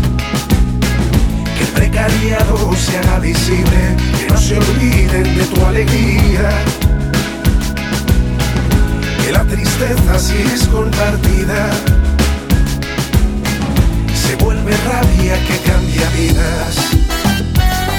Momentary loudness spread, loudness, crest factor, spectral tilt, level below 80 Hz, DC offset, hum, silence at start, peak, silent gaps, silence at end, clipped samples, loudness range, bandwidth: 3 LU; -14 LUFS; 12 dB; -5 dB/octave; -16 dBFS; under 0.1%; none; 0 s; 0 dBFS; none; 0 s; under 0.1%; 2 LU; 20 kHz